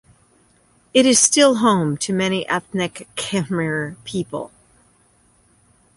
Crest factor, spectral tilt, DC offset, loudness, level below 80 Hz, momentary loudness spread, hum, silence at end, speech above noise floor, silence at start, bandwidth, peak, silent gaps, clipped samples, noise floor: 20 dB; -3.5 dB/octave; under 0.1%; -18 LUFS; -58 dBFS; 15 LU; none; 1.5 s; 39 dB; 0.95 s; 11.5 kHz; -2 dBFS; none; under 0.1%; -57 dBFS